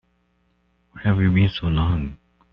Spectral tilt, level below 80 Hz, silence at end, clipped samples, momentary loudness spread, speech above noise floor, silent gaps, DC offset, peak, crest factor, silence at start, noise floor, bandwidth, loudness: -6.5 dB/octave; -38 dBFS; 0.35 s; under 0.1%; 8 LU; 46 dB; none; under 0.1%; -6 dBFS; 18 dB; 0.95 s; -65 dBFS; 5.6 kHz; -21 LUFS